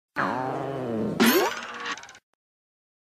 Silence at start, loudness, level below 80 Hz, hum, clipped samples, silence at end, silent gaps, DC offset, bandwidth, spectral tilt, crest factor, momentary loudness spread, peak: 0.15 s; -26 LUFS; -64 dBFS; none; under 0.1%; 0.9 s; none; under 0.1%; 15.5 kHz; -4 dB/octave; 20 dB; 13 LU; -8 dBFS